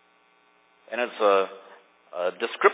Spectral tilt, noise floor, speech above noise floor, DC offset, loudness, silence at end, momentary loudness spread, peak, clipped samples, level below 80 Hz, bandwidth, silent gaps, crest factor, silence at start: -7 dB/octave; -62 dBFS; 38 dB; under 0.1%; -26 LUFS; 0 s; 15 LU; -4 dBFS; under 0.1%; under -90 dBFS; 4 kHz; none; 24 dB; 0.9 s